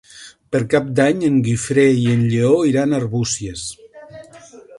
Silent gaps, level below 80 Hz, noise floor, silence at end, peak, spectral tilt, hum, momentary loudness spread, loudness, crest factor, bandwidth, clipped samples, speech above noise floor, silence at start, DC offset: none; -50 dBFS; -42 dBFS; 0 s; 0 dBFS; -6 dB/octave; none; 9 LU; -17 LUFS; 16 dB; 11.5 kHz; under 0.1%; 26 dB; 0.15 s; under 0.1%